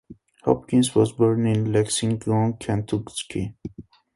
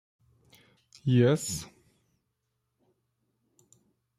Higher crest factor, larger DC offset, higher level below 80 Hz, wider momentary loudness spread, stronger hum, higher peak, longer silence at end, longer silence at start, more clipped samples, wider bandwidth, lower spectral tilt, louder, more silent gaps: about the same, 20 dB vs 22 dB; neither; first, -50 dBFS vs -66 dBFS; second, 11 LU vs 15 LU; neither; first, -2 dBFS vs -12 dBFS; second, 0.35 s vs 2.55 s; second, 0.1 s vs 1.05 s; neither; second, 11.5 kHz vs 14 kHz; about the same, -6 dB/octave vs -6 dB/octave; first, -23 LUFS vs -27 LUFS; neither